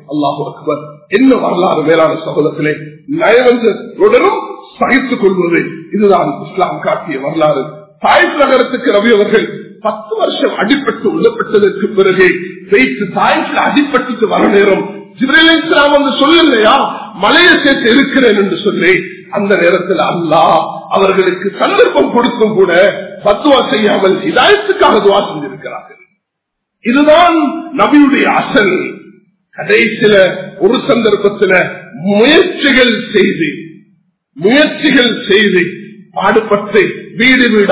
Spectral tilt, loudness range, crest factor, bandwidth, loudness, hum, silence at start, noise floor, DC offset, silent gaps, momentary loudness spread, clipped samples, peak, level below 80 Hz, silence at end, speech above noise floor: -9 dB/octave; 3 LU; 10 dB; 4 kHz; -10 LUFS; none; 0.1 s; -74 dBFS; 0.1%; none; 11 LU; 0.7%; 0 dBFS; -48 dBFS; 0 s; 64 dB